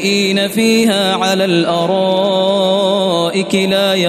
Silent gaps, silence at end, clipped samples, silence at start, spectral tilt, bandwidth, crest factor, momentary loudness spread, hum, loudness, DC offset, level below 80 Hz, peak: none; 0 s; under 0.1%; 0 s; -4.5 dB/octave; 14 kHz; 10 dB; 3 LU; none; -13 LUFS; under 0.1%; -60 dBFS; -2 dBFS